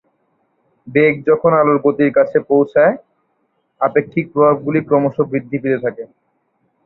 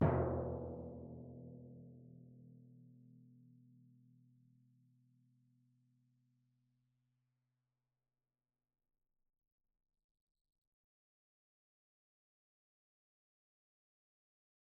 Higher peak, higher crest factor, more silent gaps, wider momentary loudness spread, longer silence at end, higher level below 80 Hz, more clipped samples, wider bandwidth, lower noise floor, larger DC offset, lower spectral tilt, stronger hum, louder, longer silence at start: first, -2 dBFS vs -22 dBFS; second, 14 dB vs 28 dB; neither; second, 8 LU vs 26 LU; second, 0.8 s vs 11.25 s; first, -58 dBFS vs -64 dBFS; neither; first, 4.2 kHz vs 2.1 kHz; second, -65 dBFS vs under -90 dBFS; neither; first, -11 dB/octave vs -7.5 dB/octave; neither; first, -15 LUFS vs -43 LUFS; first, 0.85 s vs 0 s